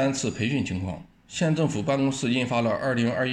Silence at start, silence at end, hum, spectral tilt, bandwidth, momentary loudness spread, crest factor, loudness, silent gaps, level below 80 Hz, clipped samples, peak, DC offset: 0 s; 0 s; none; -5.5 dB/octave; 10.5 kHz; 8 LU; 14 dB; -26 LUFS; none; -56 dBFS; under 0.1%; -12 dBFS; under 0.1%